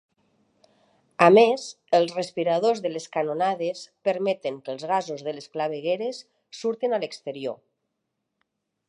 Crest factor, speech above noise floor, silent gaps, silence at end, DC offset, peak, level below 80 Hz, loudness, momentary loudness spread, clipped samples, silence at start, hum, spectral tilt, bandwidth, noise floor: 24 dB; 56 dB; none; 1.35 s; under 0.1%; -2 dBFS; -80 dBFS; -25 LUFS; 15 LU; under 0.1%; 1.2 s; none; -5 dB/octave; 11 kHz; -80 dBFS